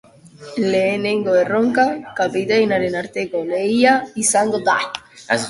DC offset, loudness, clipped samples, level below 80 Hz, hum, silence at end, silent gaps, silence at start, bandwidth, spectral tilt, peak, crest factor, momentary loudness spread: under 0.1%; -18 LUFS; under 0.1%; -60 dBFS; none; 0 s; none; 0.4 s; 11.5 kHz; -3.5 dB/octave; 0 dBFS; 18 dB; 8 LU